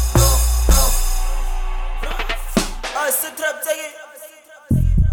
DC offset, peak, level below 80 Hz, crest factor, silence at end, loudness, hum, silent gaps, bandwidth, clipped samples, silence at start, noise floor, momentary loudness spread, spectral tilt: under 0.1%; -4 dBFS; -20 dBFS; 14 dB; 0 s; -20 LUFS; none; none; 19.5 kHz; under 0.1%; 0 s; -41 dBFS; 14 LU; -4 dB/octave